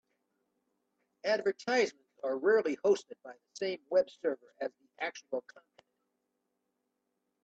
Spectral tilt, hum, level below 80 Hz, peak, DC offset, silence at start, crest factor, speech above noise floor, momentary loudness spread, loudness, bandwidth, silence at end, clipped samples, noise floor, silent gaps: -3.5 dB/octave; none; -84 dBFS; -16 dBFS; under 0.1%; 1.25 s; 18 dB; 51 dB; 13 LU; -33 LUFS; 8.2 kHz; 2.05 s; under 0.1%; -83 dBFS; none